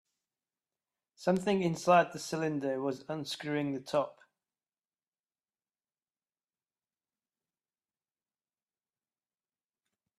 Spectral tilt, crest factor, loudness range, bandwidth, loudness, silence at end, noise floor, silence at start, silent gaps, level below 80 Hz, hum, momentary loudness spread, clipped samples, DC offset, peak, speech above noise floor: -5.5 dB/octave; 24 dB; 10 LU; 13.5 kHz; -32 LUFS; 6.05 s; under -90 dBFS; 1.2 s; none; -76 dBFS; none; 11 LU; under 0.1%; under 0.1%; -14 dBFS; over 59 dB